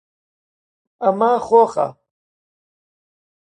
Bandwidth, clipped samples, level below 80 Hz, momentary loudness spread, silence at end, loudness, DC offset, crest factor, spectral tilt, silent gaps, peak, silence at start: 9.4 kHz; under 0.1%; -66 dBFS; 9 LU; 1.5 s; -17 LUFS; under 0.1%; 18 dB; -6.5 dB/octave; none; -2 dBFS; 1 s